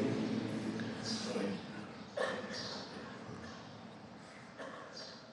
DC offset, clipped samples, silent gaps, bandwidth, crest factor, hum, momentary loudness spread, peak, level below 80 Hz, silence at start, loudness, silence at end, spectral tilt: under 0.1%; under 0.1%; none; 11.5 kHz; 20 dB; none; 14 LU; -22 dBFS; -74 dBFS; 0 s; -42 LUFS; 0 s; -5 dB/octave